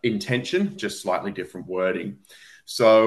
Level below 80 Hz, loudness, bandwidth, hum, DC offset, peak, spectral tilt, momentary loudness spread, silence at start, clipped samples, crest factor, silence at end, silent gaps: -66 dBFS; -25 LUFS; 12.5 kHz; none; under 0.1%; -6 dBFS; -5 dB/octave; 14 LU; 0.05 s; under 0.1%; 18 dB; 0 s; none